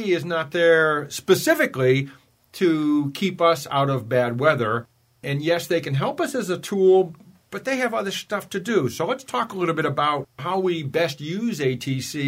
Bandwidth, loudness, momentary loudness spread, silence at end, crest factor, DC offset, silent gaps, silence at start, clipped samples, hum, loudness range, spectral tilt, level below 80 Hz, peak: 16 kHz; -22 LUFS; 9 LU; 0 s; 18 dB; under 0.1%; none; 0 s; under 0.1%; none; 4 LU; -5.5 dB/octave; -66 dBFS; -4 dBFS